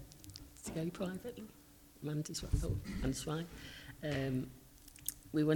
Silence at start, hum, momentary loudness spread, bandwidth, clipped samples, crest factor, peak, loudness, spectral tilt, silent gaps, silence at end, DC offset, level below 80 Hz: 0 s; none; 15 LU; 19 kHz; under 0.1%; 26 dB; -14 dBFS; -41 LUFS; -5.5 dB/octave; none; 0 s; under 0.1%; -50 dBFS